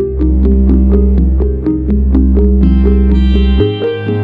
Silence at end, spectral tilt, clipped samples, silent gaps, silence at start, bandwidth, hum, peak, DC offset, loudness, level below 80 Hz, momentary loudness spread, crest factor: 0 s; -10.5 dB/octave; under 0.1%; none; 0 s; 4.1 kHz; none; 0 dBFS; under 0.1%; -11 LUFS; -10 dBFS; 4 LU; 8 dB